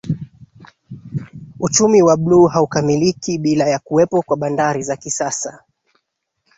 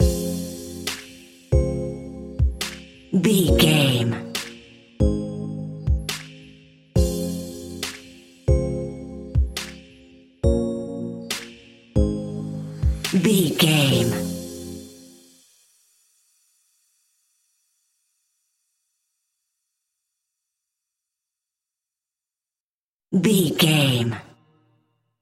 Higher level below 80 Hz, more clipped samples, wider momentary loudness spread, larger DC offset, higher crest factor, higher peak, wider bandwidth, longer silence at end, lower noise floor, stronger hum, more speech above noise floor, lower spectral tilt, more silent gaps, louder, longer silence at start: second, -52 dBFS vs -32 dBFS; neither; about the same, 17 LU vs 18 LU; neither; second, 16 dB vs 22 dB; about the same, -2 dBFS vs -2 dBFS; second, 8 kHz vs 16.5 kHz; about the same, 1 s vs 1 s; second, -73 dBFS vs under -90 dBFS; neither; second, 58 dB vs over 72 dB; about the same, -5 dB/octave vs -5 dB/octave; second, none vs 22.60-23.00 s; first, -16 LUFS vs -23 LUFS; about the same, 0.05 s vs 0 s